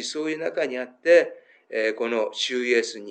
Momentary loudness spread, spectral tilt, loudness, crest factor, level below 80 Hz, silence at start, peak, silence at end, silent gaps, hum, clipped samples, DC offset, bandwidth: 10 LU; -2 dB/octave; -24 LUFS; 18 dB; under -90 dBFS; 0 s; -6 dBFS; 0 s; none; none; under 0.1%; under 0.1%; 9.2 kHz